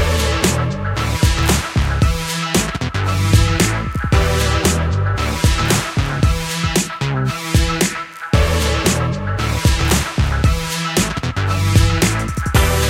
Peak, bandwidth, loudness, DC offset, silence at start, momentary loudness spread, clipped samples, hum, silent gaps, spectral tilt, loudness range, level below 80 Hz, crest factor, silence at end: 0 dBFS; 17 kHz; -17 LUFS; under 0.1%; 0 s; 5 LU; under 0.1%; none; none; -4.5 dB/octave; 1 LU; -22 dBFS; 16 dB; 0 s